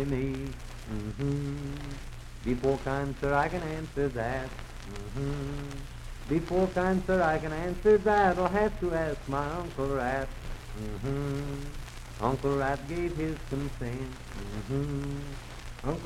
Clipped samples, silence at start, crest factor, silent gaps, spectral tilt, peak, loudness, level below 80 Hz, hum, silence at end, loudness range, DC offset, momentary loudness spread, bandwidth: under 0.1%; 0 s; 20 dB; none; -7 dB/octave; -10 dBFS; -31 LUFS; -42 dBFS; none; 0 s; 7 LU; under 0.1%; 15 LU; 15.5 kHz